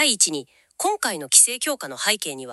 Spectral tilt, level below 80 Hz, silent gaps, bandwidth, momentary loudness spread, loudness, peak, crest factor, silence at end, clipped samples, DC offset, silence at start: 0.5 dB/octave; -78 dBFS; none; 13.5 kHz; 12 LU; -19 LUFS; 0 dBFS; 22 dB; 0 s; under 0.1%; under 0.1%; 0 s